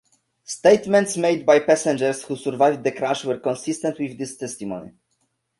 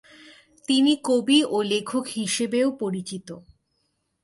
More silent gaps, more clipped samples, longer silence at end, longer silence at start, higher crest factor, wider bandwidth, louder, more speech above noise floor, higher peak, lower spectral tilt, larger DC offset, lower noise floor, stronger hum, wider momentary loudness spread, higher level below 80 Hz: neither; neither; second, 0.7 s vs 0.85 s; second, 0.5 s vs 0.7 s; about the same, 20 dB vs 18 dB; about the same, 11.5 kHz vs 11.5 kHz; about the same, -21 LUFS vs -23 LUFS; about the same, 51 dB vs 50 dB; first, -2 dBFS vs -6 dBFS; about the same, -4.5 dB/octave vs -3.5 dB/octave; neither; about the same, -71 dBFS vs -73 dBFS; neither; second, 14 LU vs 17 LU; about the same, -64 dBFS vs -68 dBFS